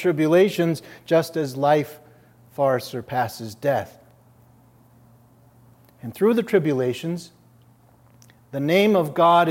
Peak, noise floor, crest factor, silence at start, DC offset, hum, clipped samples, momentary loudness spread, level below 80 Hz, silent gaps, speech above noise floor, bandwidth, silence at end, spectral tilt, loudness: -4 dBFS; -54 dBFS; 18 dB; 0 s; under 0.1%; none; under 0.1%; 16 LU; -68 dBFS; none; 34 dB; 16.5 kHz; 0 s; -6.5 dB/octave; -21 LUFS